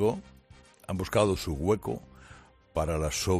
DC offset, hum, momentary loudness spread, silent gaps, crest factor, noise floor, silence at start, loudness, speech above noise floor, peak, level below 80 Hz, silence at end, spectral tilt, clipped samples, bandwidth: under 0.1%; none; 14 LU; none; 20 dB; -56 dBFS; 0 s; -30 LUFS; 27 dB; -10 dBFS; -46 dBFS; 0 s; -5.5 dB/octave; under 0.1%; 15 kHz